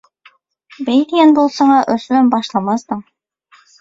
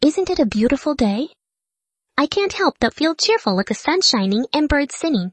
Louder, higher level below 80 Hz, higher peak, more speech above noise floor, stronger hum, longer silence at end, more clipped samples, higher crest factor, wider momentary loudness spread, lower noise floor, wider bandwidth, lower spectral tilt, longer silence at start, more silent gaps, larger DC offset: first, -13 LUFS vs -18 LUFS; second, -60 dBFS vs -42 dBFS; first, 0 dBFS vs -4 dBFS; second, 39 dB vs 66 dB; neither; first, 0.8 s vs 0 s; neither; about the same, 14 dB vs 16 dB; first, 13 LU vs 6 LU; second, -52 dBFS vs -84 dBFS; second, 7.8 kHz vs 8.8 kHz; first, -5.5 dB/octave vs -4 dB/octave; first, 0.8 s vs 0 s; neither; neither